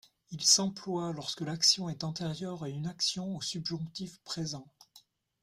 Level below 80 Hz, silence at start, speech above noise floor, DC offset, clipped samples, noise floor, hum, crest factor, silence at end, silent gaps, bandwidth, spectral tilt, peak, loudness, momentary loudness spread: -70 dBFS; 0.3 s; 30 dB; under 0.1%; under 0.1%; -63 dBFS; none; 24 dB; 0.45 s; none; 16 kHz; -3 dB/octave; -10 dBFS; -31 LUFS; 15 LU